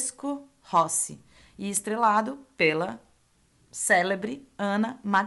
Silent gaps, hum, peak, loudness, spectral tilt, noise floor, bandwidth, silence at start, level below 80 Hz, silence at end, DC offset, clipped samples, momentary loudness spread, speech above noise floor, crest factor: none; none; -8 dBFS; -26 LUFS; -3 dB/octave; -64 dBFS; 12 kHz; 0 s; -68 dBFS; 0 s; under 0.1%; under 0.1%; 13 LU; 38 dB; 18 dB